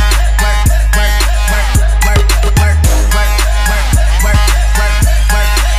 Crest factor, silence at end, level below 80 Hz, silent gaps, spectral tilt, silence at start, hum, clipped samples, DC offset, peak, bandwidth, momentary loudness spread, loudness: 8 dB; 0 s; -10 dBFS; none; -3.5 dB/octave; 0 s; none; under 0.1%; under 0.1%; 0 dBFS; 15.5 kHz; 2 LU; -11 LUFS